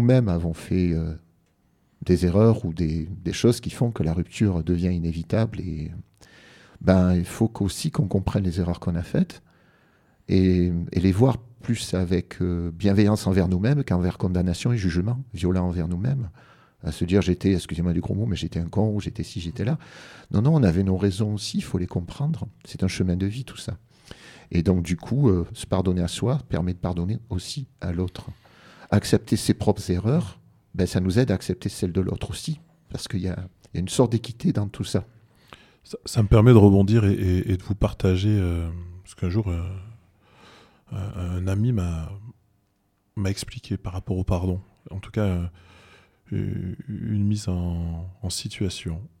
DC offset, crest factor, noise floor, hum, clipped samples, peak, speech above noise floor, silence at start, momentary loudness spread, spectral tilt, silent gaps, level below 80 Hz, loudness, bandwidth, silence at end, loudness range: under 0.1%; 22 dB; -68 dBFS; none; under 0.1%; -2 dBFS; 46 dB; 0 s; 13 LU; -7 dB/octave; none; -42 dBFS; -24 LUFS; 14 kHz; 0.15 s; 9 LU